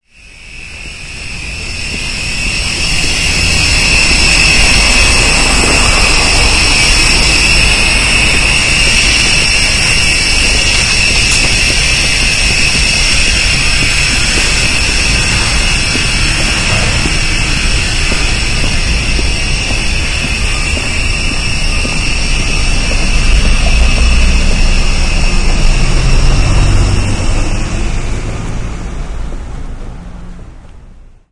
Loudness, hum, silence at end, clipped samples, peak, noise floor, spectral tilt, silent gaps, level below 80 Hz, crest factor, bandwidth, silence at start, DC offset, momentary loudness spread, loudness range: -9 LUFS; none; 0.3 s; 0.2%; 0 dBFS; -35 dBFS; -2.5 dB/octave; none; -14 dBFS; 10 dB; 11.5 kHz; 0.25 s; under 0.1%; 13 LU; 8 LU